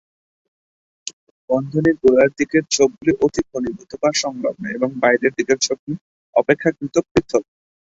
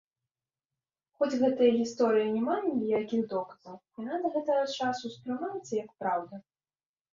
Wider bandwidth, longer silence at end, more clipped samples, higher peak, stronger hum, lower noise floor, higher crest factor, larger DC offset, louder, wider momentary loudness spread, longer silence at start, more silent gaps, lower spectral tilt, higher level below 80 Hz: about the same, 8 kHz vs 7.6 kHz; second, 0.5 s vs 0.7 s; neither; first, -2 dBFS vs -12 dBFS; neither; about the same, under -90 dBFS vs under -90 dBFS; about the same, 18 dB vs 18 dB; neither; first, -19 LUFS vs -30 LUFS; second, 11 LU vs 14 LU; second, 1.05 s vs 1.2 s; first, 1.13-1.48 s, 5.79-5.87 s, 6.01-6.33 s, 7.11-7.15 s vs none; second, -4 dB/octave vs -5.5 dB/octave; first, -50 dBFS vs -74 dBFS